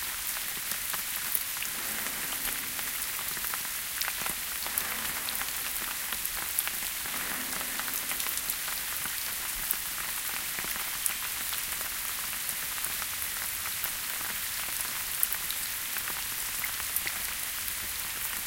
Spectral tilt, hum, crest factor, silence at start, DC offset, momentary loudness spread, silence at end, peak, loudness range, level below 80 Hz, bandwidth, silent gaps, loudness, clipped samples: 0.5 dB/octave; none; 32 dB; 0 s; under 0.1%; 2 LU; 0 s; -2 dBFS; 1 LU; -56 dBFS; 17 kHz; none; -30 LUFS; under 0.1%